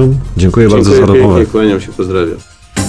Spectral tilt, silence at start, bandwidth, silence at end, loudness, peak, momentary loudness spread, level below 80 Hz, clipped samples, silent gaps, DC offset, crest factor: -7 dB/octave; 0 s; 11 kHz; 0 s; -9 LUFS; 0 dBFS; 11 LU; -26 dBFS; 0.6%; none; under 0.1%; 8 dB